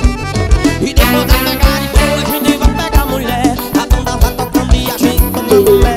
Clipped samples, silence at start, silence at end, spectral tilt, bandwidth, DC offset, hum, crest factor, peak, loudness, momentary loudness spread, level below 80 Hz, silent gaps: 0.5%; 0 s; 0 s; -5 dB/octave; 16.5 kHz; under 0.1%; none; 10 dB; 0 dBFS; -12 LUFS; 5 LU; -14 dBFS; none